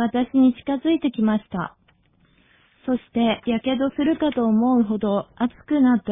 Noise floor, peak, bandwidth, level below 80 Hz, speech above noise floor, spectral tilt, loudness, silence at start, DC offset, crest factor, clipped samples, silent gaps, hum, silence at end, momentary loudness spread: -60 dBFS; -8 dBFS; 3.8 kHz; -54 dBFS; 39 dB; -10.5 dB/octave; -21 LUFS; 0 s; under 0.1%; 14 dB; under 0.1%; none; none; 0 s; 8 LU